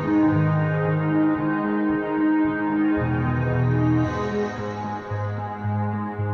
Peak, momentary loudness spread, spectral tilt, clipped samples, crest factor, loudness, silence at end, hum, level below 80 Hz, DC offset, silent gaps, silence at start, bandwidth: -10 dBFS; 8 LU; -9.5 dB/octave; under 0.1%; 12 dB; -23 LUFS; 0 s; none; -46 dBFS; under 0.1%; none; 0 s; 6.6 kHz